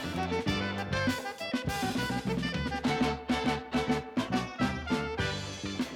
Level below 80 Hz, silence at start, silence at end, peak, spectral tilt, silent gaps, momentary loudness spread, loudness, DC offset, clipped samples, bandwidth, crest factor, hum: -48 dBFS; 0 s; 0 s; -18 dBFS; -5 dB/octave; none; 3 LU; -32 LUFS; under 0.1%; under 0.1%; 17 kHz; 14 dB; none